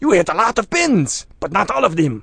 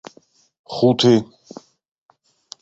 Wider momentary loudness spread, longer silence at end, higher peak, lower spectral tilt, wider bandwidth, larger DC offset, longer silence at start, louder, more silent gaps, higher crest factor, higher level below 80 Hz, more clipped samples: second, 6 LU vs 24 LU; second, 0 s vs 1.35 s; first, 0 dBFS vs -4 dBFS; second, -4.5 dB/octave vs -6 dB/octave; first, 10.5 kHz vs 8 kHz; neither; second, 0 s vs 0.7 s; about the same, -17 LUFS vs -16 LUFS; neither; about the same, 16 dB vs 18 dB; first, -44 dBFS vs -60 dBFS; neither